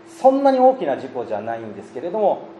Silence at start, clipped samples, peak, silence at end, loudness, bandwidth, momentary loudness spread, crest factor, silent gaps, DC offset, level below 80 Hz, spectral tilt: 0.05 s; under 0.1%; -2 dBFS; 0 s; -19 LUFS; 10 kHz; 15 LU; 18 dB; none; under 0.1%; -74 dBFS; -6.5 dB/octave